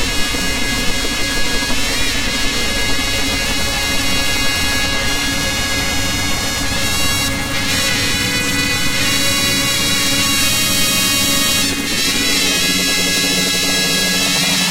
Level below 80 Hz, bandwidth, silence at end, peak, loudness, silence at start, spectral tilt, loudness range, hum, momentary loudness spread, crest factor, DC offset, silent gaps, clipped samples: -28 dBFS; 17 kHz; 0 s; 0 dBFS; -14 LUFS; 0 s; -1.5 dB/octave; 3 LU; none; 4 LU; 16 dB; under 0.1%; none; under 0.1%